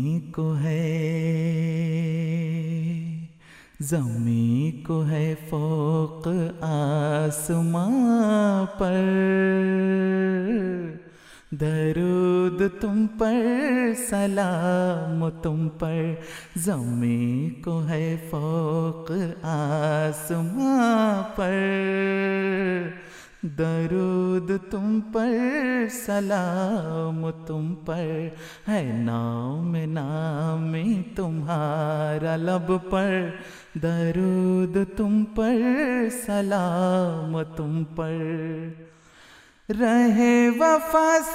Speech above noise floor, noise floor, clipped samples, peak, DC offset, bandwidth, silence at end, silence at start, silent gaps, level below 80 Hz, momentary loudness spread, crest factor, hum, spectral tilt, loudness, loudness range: 28 dB; -52 dBFS; under 0.1%; -8 dBFS; under 0.1%; 15.5 kHz; 0 s; 0 s; none; -52 dBFS; 9 LU; 16 dB; none; -7 dB/octave; -24 LUFS; 4 LU